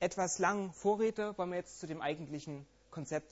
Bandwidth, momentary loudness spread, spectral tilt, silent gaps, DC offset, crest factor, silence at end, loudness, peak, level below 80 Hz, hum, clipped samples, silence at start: 8.2 kHz; 15 LU; -4.5 dB/octave; none; under 0.1%; 20 dB; 0.05 s; -36 LUFS; -18 dBFS; -70 dBFS; none; under 0.1%; 0 s